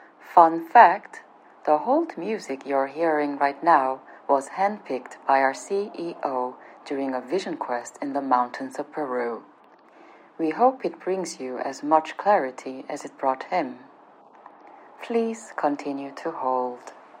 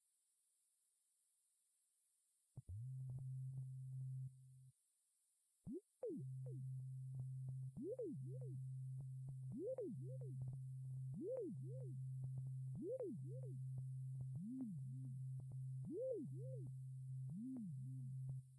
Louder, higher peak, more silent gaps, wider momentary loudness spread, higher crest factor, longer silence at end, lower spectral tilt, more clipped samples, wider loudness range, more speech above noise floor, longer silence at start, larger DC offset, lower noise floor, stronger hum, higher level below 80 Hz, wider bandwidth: first, -24 LUFS vs -51 LUFS; first, 0 dBFS vs -36 dBFS; neither; first, 15 LU vs 5 LU; first, 24 dB vs 14 dB; first, 0.25 s vs 0 s; second, -4.5 dB/octave vs -11 dB/octave; neither; first, 8 LU vs 4 LU; second, 29 dB vs 34 dB; second, 0.25 s vs 2.55 s; neither; second, -53 dBFS vs -84 dBFS; neither; second, under -90 dBFS vs -78 dBFS; about the same, 10.5 kHz vs 11 kHz